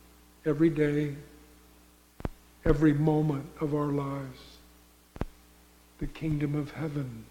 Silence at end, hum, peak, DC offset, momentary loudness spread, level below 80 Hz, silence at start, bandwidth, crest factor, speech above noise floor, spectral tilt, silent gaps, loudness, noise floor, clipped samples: 0.05 s; 60 Hz at -60 dBFS; -10 dBFS; under 0.1%; 17 LU; -44 dBFS; 0.45 s; 16.5 kHz; 20 dB; 30 dB; -8.5 dB/octave; none; -30 LUFS; -58 dBFS; under 0.1%